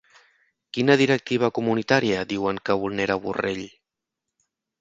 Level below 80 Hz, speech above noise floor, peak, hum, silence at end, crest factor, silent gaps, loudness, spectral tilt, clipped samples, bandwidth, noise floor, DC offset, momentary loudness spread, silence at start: -58 dBFS; 62 dB; -4 dBFS; none; 1.1 s; 22 dB; none; -23 LUFS; -5.5 dB/octave; under 0.1%; 7.8 kHz; -85 dBFS; under 0.1%; 10 LU; 0.75 s